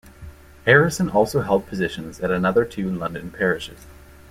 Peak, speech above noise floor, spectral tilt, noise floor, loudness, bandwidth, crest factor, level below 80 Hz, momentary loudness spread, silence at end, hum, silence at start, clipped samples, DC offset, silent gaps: -2 dBFS; 21 dB; -5.5 dB/octave; -42 dBFS; -21 LUFS; 16 kHz; 20 dB; -46 dBFS; 12 LU; 0.35 s; none; 0.05 s; under 0.1%; under 0.1%; none